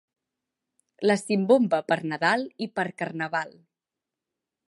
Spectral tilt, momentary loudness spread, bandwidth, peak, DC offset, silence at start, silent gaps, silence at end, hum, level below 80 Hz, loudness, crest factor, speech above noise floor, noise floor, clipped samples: -5.5 dB/octave; 10 LU; 11.5 kHz; -6 dBFS; under 0.1%; 1 s; none; 1.15 s; none; -80 dBFS; -25 LUFS; 20 dB; 63 dB; -88 dBFS; under 0.1%